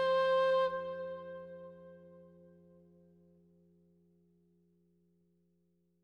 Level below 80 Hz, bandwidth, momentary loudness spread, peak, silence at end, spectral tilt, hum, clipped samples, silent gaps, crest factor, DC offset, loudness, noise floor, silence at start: -80 dBFS; 6.6 kHz; 26 LU; -22 dBFS; 3.8 s; -5 dB/octave; none; under 0.1%; none; 16 dB; under 0.1%; -33 LUFS; -76 dBFS; 0 s